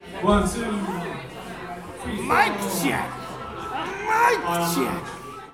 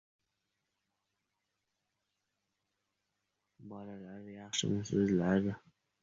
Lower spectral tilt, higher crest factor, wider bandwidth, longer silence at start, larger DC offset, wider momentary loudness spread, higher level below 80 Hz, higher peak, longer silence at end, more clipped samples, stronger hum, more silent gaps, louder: about the same, -4.5 dB/octave vs -5.5 dB/octave; about the same, 20 dB vs 22 dB; first, 17.5 kHz vs 7.4 kHz; second, 0 s vs 3.6 s; neither; second, 15 LU vs 19 LU; first, -42 dBFS vs -66 dBFS; first, -6 dBFS vs -18 dBFS; second, 0 s vs 0.45 s; neither; neither; neither; first, -24 LUFS vs -33 LUFS